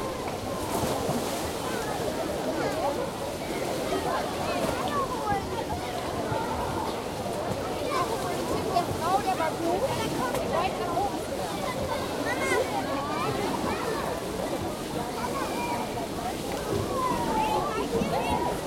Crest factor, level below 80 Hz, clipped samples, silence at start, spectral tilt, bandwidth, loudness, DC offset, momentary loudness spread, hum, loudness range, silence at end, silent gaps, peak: 16 dB; -48 dBFS; under 0.1%; 0 s; -4.5 dB/octave; 16.5 kHz; -29 LUFS; under 0.1%; 5 LU; none; 2 LU; 0 s; none; -12 dBFS